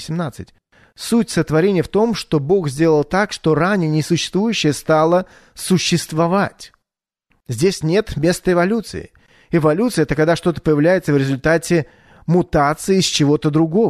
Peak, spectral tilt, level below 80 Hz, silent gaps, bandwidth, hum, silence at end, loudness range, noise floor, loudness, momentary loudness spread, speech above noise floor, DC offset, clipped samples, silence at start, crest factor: -4 dBFS; -5.5 dB/octave; -42 dBFS; none; 13.5 kHz; none; 0 s; 3 LU; -81 dBFS; -17 LUFS; 8 LU; 65 dB; under 0.1%; under 0.1%; 0 s; 14 dB